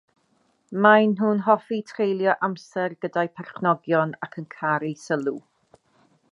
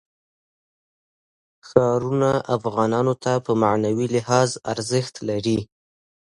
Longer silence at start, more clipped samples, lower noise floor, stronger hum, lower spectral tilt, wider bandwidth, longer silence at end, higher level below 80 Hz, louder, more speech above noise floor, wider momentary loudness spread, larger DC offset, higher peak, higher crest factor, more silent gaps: second, 0.7 s vs 1.65 s; neither; second, -67 dBFS vs under -90 dBFS; neither; about the same, -7 dB/octave vs -6 dB/octave; about the same, 10.5 kHz vs 11.5 kHz; first, 0.95 s vs 0.65 s; second, -76 dBFS vs -56 dBFS; about the same, -23 LUFS vs -22 LUFS; second, 44 dB vs over 69 dB; first, 13 LU vs 6 LU; neither; about the same, -2 dBFS vs 0 dBFS; about the same, 22 dB vs 22 dB; neither